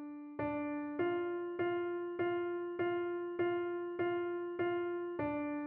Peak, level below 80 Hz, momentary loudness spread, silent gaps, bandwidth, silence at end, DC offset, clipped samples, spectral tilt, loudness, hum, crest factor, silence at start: -24 dBFS; -72 dBFS; 4 LU; none; 3.5 kHz; 0 s; under 0.1%; under 0.1%; -5 dB/octave; -38 LUFS; none; 14 dB; 0 s